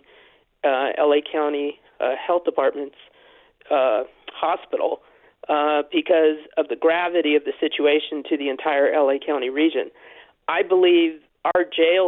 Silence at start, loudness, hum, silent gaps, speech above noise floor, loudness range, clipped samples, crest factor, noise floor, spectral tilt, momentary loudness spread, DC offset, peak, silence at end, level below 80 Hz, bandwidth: 0.65 s; -21 LUFS; none; none; 34 dB; 4 LU; under 0.1%; 16 dB; -55 dBFS; -7 dB/octave; 9 LU; under 0.1%; -6 dBFS; 0 s; -70 dBFS; 4.1 kHz